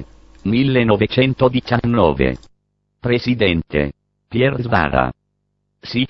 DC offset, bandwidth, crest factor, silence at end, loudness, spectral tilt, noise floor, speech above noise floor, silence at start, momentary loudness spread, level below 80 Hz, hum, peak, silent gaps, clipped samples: under 0.1%; 6.2 kHz; 18 dB; 0 s; -17 LUFS; -8.5 dB/octave; -70 dBFS; 54 dB; 0 s; 10 LU; -36 dBFS; 50 Hz at -45 dBFS; 0 dBFS; none; under 0.1%